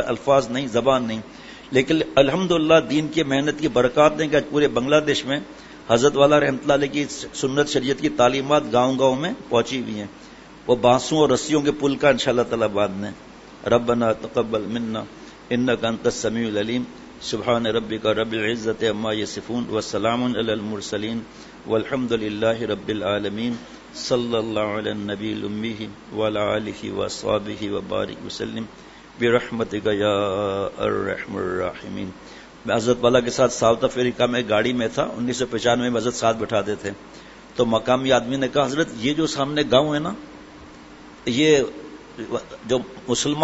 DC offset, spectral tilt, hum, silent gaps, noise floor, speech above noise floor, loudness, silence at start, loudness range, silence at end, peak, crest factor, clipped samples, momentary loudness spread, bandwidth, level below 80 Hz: under 0.1%; -4.5 dB/octave; none; none; -43 dBFS; 22 dB; -22 LUFS; 0 s; 6 LU; 0 s; 0 dBFS; 22 dB; under 0.1%; 13 LU; 8 kHz; -50 dBFS